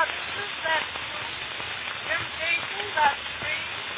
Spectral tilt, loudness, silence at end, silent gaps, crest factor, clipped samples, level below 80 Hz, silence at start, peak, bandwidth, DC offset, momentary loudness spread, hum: 1 dB/octave; -27 LUFS; 0 s; none; 20 dB; under 0.1%; -56 dBFS; 0 s; -8 dBFS; 4 kHz; under 0.1%; 8 LU; none